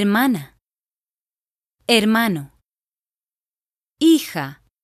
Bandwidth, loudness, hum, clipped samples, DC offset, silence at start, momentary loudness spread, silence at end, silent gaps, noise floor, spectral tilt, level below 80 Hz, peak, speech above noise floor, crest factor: 14.5 kHz; -18 LUFS; none; under 0.1%; under 0.1%; 0 s; 13 LU; 0.3 s; none; under -90 dBFS; -4.5 dB/octave; -62 dBFS; -2 dBFS; over 73 dB; 20 dB